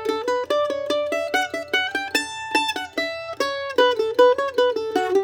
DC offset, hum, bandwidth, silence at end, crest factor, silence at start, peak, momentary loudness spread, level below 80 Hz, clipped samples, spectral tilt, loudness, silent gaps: under 0.1%; none; 18.5 kHz; 0 s; 20 dB; 0 s; -2 dBFS; 8 LU; -64 dBFS; under 0.1%; -2 dB/octave; -22 LUFS; none